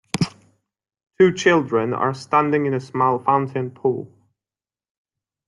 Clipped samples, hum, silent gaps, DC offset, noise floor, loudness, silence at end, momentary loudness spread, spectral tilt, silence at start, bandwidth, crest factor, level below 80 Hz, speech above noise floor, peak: under 0.1%; none; none; under 0.1%; under -90 dBFS; -20 LUFS; 1.4 s; 9 LU; -6 dB/octave; 0.15 s; 11.5 kHz; 18 dB; -60 dBFS; over 71 dB; -4 dBFS